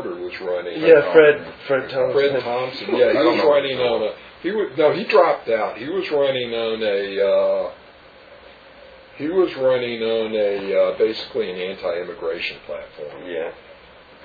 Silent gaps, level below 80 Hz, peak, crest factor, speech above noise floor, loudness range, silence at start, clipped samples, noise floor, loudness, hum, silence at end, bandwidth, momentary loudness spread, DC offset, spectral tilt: none; -58 dBFS; 0 dBFS; 20 dB; 26 dB; 6 LU; 0 s; under 0.1%; -46 dBFS; -20 LUFS; none; 0.5 s; 4.9 kHz; 13 LU; under 0.1%; -7 dB/octave